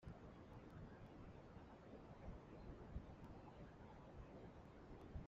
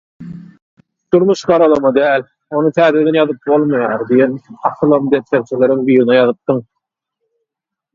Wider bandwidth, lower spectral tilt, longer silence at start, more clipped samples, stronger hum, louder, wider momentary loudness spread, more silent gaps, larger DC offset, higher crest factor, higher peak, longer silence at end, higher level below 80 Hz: about the same, 7.4 kHz vs 7.6 kHz; about the same, -7 dB/octave vs -7 dB/octave; second, 0 s vs 0.2 s; neither; neither; second, -60 LUFS vs -13 LUFS; second, 4 LU vs 9 LU; second, none vs 0.62-0.77 s; neither; first, 20 dB vs 14 dB; second, -40 dBFS vs 0 dBFS; second, 0 s vs 1.35 s; second, -64 dBFS vs -56 dBFS